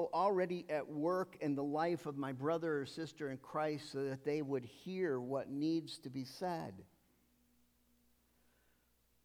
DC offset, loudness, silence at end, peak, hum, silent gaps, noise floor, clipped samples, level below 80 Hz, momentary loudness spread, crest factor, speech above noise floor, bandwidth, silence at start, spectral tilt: under 0.1%; -40 LUFS; 2.4 s; -24 dBFS; none; none; -75 dBFS; under 0.1%; -80 dBFS; 9 LU; 18 dB; 36 dB; 16.5 kHz; 0 s; -6.5 dB/octave